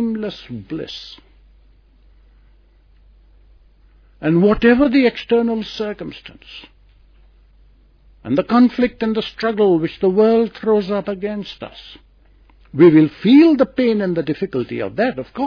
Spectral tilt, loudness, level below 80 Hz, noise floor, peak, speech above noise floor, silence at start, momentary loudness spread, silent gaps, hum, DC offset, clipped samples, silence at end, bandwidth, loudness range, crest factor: -8 dB/octave; -16 LUFS; -46 dBFS; -51 dBFS; 0 dBFS; 35 dB; 0 s; 21 LU; none; none; under 0.1%; under 0.1%; 0 s; 5.4 kHz; 10 LU; 18 dB